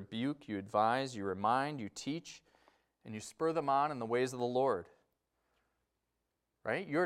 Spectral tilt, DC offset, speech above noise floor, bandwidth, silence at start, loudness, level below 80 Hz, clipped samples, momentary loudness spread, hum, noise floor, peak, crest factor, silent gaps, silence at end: -5.5 dB/octave; under 0.1%; 50 dB; 14 kHz; 0 s; -36 LUFS; -80 dBFS; under 0.1%; 14 LU; none; -86 dBFS; -18 dBFS; 20 dB; none; 0 s